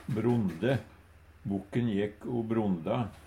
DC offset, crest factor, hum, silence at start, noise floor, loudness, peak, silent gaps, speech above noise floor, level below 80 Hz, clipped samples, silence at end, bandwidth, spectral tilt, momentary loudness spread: under 0.1%; 16 dB; none; 0 s; -56 dBFS; -32 LUFS; -16 dBFS; none; 25 dB; -58 dBFS; under 0.1%; 0 s; 15 kHz; -8.5 dB/octave; 7 LU